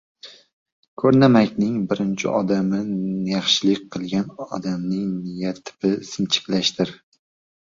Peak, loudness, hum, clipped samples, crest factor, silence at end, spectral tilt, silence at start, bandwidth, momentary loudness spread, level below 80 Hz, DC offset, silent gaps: -2 dBFS; -21 LUFS; none; under 0.1%; 20 dB; 0.8 s; -5.5 dB/octave; 0.25 s; 7.6 kHz; 11 LU; -60 dBFS; under 0.1%; 0.53-0.66 s, 0.72-0.97 s